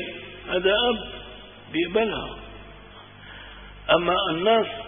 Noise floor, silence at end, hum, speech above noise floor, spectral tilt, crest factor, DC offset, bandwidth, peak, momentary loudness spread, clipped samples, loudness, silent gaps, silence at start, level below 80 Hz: -45 dBFS; 0 s; 50 Hz at -50 dBFS; 23 dB; -9 dB/octave; 22 dB; under 0.1%; 3.8 kHz; -4 dBFS; 23 LU; under 0.1%; -23 LUFS; none; 0 s; -48 dBFS